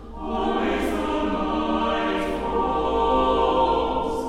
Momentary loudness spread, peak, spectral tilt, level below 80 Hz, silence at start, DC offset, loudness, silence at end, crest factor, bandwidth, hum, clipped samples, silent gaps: 5 LU; -8 dBFS; -6 dB/octave; -38 dBFS; 0 s; under 0.1%; -23 LUFS; 0 s; 14 dB; 15 kHz; none; under 0.1%; none